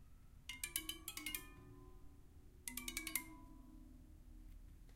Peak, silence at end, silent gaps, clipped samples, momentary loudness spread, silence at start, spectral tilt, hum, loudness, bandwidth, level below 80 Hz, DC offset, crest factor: -18 dBFS; 0 s; none; under 0.1%; 20 LU; 0 s; -1 dB/octave; none; -46 LUFS; 16.5 kHz; -60 dBFS; under 0.1%; 34 dB